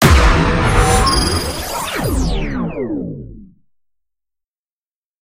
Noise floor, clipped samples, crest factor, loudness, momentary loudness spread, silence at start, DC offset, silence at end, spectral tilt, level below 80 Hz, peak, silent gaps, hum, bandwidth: under -90 dBFS; under 0.1%; 16 dB; -16 LUFS; 12 LU; 0 s; under 0.1%; 1.75 s; -4.5 dB/octave; -20 dBFS; 0 dBFS; none; none; 16 kHz